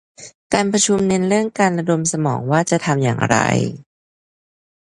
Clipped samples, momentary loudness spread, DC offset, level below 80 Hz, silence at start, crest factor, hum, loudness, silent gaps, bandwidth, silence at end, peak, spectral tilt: under 0.1%; 5 LU; under 0.1%; -52 dBFS; 0.2 s; 18 dB; none; -17 LUFS; 0.35-0.50 s; 11.5 kHz; 1 s; 0 dBFS; -4.5 dB/octave